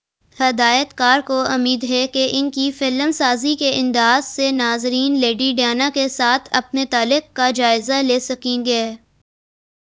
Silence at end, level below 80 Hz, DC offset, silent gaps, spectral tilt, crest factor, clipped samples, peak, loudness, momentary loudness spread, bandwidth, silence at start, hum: 0.85 s; -60 dBFS; under 0.1%; none; -2 dB/octave; 18 dB; under 0.1%; 0 dBFS; -17 LUFS; 4 LU; 8 kHz; 0.4 s; none